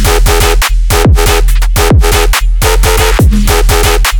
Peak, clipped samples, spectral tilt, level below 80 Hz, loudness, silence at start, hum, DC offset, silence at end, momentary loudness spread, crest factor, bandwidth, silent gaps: 0 dBFS; 0.3%; -4 dB/octave; -8 dBFS; -9 LUFS; 0 s; none; under 0.1%; 0 s; 3 LU; 6 dB; over 20 kHz; none